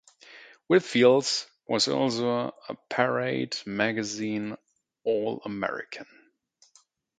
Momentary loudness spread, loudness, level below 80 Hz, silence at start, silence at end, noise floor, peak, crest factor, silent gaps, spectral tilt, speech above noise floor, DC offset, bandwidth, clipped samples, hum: 16 LU; -27 LUFS; -70 dBFS; 0.3 s; 1.15 s; -64 dBFS; -6 dBFS; 22 dB; none; -4 dB/octave; 38 dB; under 0.1%; 9.4 kHz; under 0.1%; none